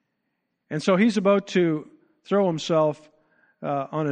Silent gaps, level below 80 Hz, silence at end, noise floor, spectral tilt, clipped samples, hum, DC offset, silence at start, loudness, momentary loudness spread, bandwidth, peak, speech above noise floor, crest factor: none; -72 dBFS; 0 s; -77 dBFS; -6.5 dB/octave; under 0.1%; none; under 0.1%; 0.7 s; -23 LUFS; 12 LU; 9.4 kHz; -6 dBFS; 55 dB; 18 dB